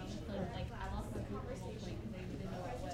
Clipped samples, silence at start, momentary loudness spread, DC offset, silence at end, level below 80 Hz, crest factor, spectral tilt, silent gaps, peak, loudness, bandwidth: under 0.1%; 0 s; 3 LU; under 0.1%; 0 s; -50 dBFS; 14 dB; -6.5 dB/octave; none; -30 dBFS; -44 LUFS; 16 kHz